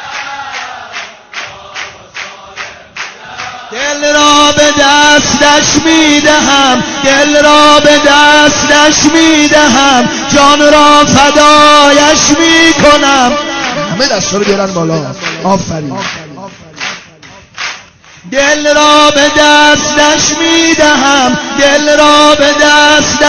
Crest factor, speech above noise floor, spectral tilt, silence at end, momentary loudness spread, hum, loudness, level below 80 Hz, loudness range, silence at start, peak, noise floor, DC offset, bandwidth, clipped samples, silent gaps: 8 dB; 29 dB; -2 dB/octave; 0 s; 19 LU; none; -5 LUFS; -36 dBFS; 12 LU; 0 s; 0 dBFS; -35 dBFS; under 0.1%; 11 kHz; 5%; none